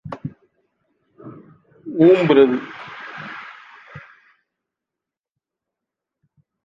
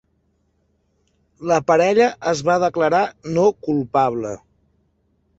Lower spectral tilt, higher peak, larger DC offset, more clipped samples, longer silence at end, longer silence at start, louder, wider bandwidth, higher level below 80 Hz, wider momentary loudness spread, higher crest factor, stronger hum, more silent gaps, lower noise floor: first, -8 dB/octave vs -5.5 dB/octave; about the same, -2 dBFS vs -2 dBFS; neither; neither; first, 2.65 s vs 1 s; second, 0.05 s vs 1.4 s; first, -15 LUFS vs -18 LUFS; about the same, 7.4 kHz vs 8 kHz; second, -64 dBFS vs -58 dBFS; first, 28 LU vs 11 LU; about the same, 20 dB vs 18 dB; neither; neither; first, -87 dBFS vs -65 dBFS